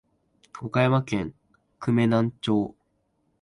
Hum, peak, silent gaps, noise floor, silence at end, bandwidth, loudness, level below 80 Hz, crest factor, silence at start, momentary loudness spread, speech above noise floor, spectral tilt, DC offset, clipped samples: none; -8 dBFS; none; -71 dBFS; 0.7 s; 11 kHz; -25 LUFS; -58 dBFS; 18 dB; 0.55 s; 12 LU; 48 dB; -7.5 dB/octave; under 0.1%; under 0.1%